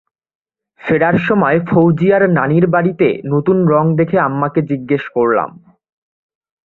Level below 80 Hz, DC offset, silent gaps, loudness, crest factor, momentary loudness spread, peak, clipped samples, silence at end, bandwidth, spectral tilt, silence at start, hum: -52 dBFS; under 0.1%; none; -14 LUFS; 14 dB; 6 LU; 0 dBFS; under 0.1%; 1.15 s; 4.2 kHz; -10.5 dB/octave; 0.85 s; none